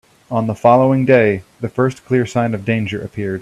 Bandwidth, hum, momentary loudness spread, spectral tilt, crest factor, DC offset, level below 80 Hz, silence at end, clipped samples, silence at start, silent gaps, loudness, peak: 12 kHz; none; 11 LU; -7.5 dB/octave; 16 dB; under 0.1%; -52 dBFS; 0 s; under 0.1%; 0.3 s; none; -16 LUFS; 0 dBFS